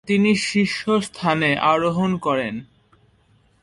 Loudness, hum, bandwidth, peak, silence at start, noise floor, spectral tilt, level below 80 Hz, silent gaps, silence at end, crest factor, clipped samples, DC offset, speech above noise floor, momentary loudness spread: -20 LUFS; none; 11.5 kHz; -4 dBFS; 0.05 s; -59 dBFS; -5.5 dB/octave; -56 dBFS; none; 1 s; 16 dB; under 0.1%; under 0.1%; 39 dB; 6 LU